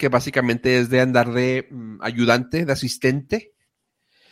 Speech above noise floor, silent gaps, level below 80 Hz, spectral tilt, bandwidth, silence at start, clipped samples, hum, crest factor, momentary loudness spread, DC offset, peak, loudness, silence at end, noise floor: 53 dB; none; -54 dBFS; -5.5 dB/octave; 16 kHz; 0 s; under 0.1%; none; 20 dB; 10 LU; under 0.1%; -2 dBFS; -20 LUFS; 0.9 s; -73 dBFS